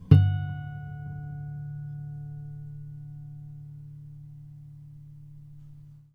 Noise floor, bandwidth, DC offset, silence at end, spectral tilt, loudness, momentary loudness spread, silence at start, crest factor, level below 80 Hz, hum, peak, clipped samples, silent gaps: -48 dBFS; 4.5 kHz; under 0.1%; 0.15 s; -10 dB/octave; -31 LUFS; 17 LU; 0 s; 28 dB; -50 dBFS; none; -2 dBFS; under 0.1%; none